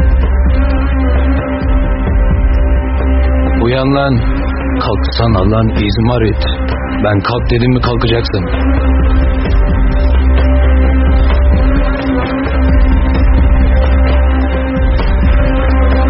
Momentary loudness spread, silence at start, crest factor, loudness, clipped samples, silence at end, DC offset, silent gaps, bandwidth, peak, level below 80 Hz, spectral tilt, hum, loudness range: 4 LU; 0 s; 10 dB; -12 LUFS; under 0.1%; 0 s; under 0.1%; none; 5.8 kHz; 0 dBFS; -12 dBFS; -6.5 dB/octave; none; 1 LU